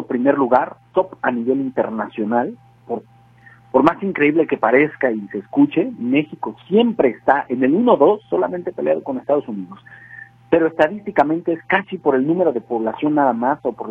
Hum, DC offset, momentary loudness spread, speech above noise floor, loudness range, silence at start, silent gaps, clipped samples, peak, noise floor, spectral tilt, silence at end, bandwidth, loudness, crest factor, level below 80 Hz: none; under 0.1%; 13 LU; 30 dB; 3 LU; 0 s; none; under 0.1%; 0 dBFS; -48 dBFS; -8.5 dB/octave; 0 s; 5.2 kHz; -18 LUFS; 18 dB; -60 dBFS